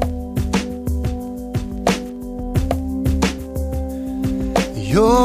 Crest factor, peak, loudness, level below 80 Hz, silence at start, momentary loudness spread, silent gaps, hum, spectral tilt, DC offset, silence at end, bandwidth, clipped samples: 18 dB; -2 dBFS; -22 LUFS; -28 dBFS; 0 s; 7 LU; none; none; -6 dB/octave; under 0.1%; 0 s; 15.5 kHz; under 0.1%